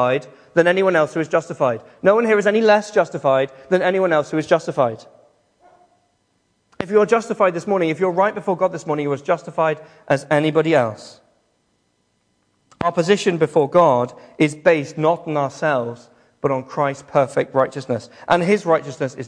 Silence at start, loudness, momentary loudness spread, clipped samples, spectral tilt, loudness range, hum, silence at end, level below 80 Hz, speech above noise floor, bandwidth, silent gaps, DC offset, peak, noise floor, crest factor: 0 s; -19 LUFS; 8 LU; under 0.1%; -6 dB/octave; 4 LU; none; 0 s; -62 dBFS; 48 dB; 10.5 kHz; none; under 0.1%; -2 dBFS; -66 dBFS; 18 dB